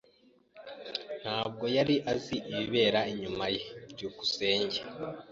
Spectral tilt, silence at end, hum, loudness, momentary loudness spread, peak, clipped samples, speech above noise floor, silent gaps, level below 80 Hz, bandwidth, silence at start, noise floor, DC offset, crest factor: -4.5 dB/octave; 0 s; none; -31 LUFS; 14 LU; -12 dBFS; under 0.1%; 33 dB; none; -64 dBFS; 7.8 kHz; 0.55 s; -64 dBFS; under 0.1%; 20 dB